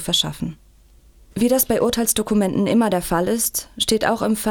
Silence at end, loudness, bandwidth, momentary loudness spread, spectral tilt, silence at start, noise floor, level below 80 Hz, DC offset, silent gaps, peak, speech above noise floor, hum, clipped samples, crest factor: 0 s; -19 LUFS; 20 kHz; 6 LU; -3.5 dB/octave; 0 s; -50 dBFS; -44 dBFS; under 0.1%; none; -4 dBFS; 31 dB; none; under 0.1%; 16 dB